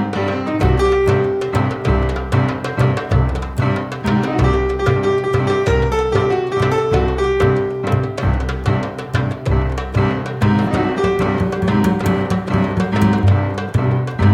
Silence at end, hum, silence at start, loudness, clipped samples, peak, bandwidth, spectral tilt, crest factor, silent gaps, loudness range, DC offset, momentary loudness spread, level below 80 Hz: 0 s; none; 0 s; -17 LUFS; under 0.1%; -2 dBFS; 13.5 kHz; -7.5 dB/octave; 14 dB; none; 2 LU; under 0.1%; 4 LU; -26 dBFS